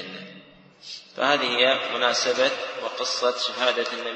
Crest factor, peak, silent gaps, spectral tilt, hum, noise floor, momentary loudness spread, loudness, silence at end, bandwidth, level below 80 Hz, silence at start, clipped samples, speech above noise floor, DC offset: 20 dB; -4 dBFS; none; -1 dB/octave; none; -49 dBFS; 18 LU; -23 LUFS; 0 s; 8.8 kHz; -76 dBFS; 0 s; under 0.1%; 25 dB; under 0.1%